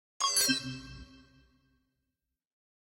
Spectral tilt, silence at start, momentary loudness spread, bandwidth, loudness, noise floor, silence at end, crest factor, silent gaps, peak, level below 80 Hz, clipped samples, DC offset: -1 dB/octave; 0.2 s; 23 LU; 16.5 kHz; -28 LUFS; -87 dBFS; 1.7 s; 22 dB; none; -16 dBFS; -62 dBFS; under 0.1%; under 0.1%